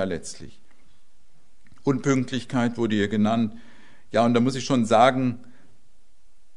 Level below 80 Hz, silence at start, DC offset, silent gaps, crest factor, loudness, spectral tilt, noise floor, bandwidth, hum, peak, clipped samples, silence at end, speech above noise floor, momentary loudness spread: -60 dBFS; 0 s; 1%; none; 20 dB; -23 LUFS; -6 dB/octave; -62 dBFS; 11 kHz; none; -4 dBFS; under 0.1%; 1.2 s; 40 dB; 12 LU